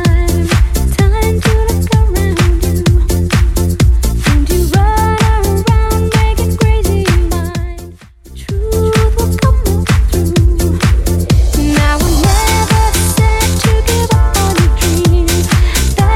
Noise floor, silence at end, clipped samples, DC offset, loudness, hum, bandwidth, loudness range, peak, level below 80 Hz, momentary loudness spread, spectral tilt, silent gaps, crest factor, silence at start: -33 dBFS; 0 s; under 0.1%; under 0.1%; -12 LUFS; none; 17 kHz; 3 LU; 0 dBFS; -14 dBFS; 3 LU; -5.5 dB/octave; none; 10 dB; 0 s